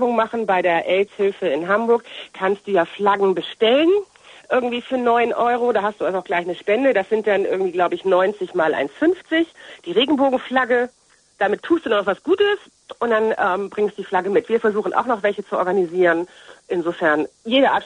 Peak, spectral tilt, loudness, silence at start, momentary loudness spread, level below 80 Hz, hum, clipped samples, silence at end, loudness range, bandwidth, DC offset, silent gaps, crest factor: -4 dBFS; -5.5 dB/octave; -20 LUFS; 0 s; 6 LU; -64 dBFS; none; under 0.1%; 0 s; 1 LU; 10 kHz; under 0.1%; none; 16 dB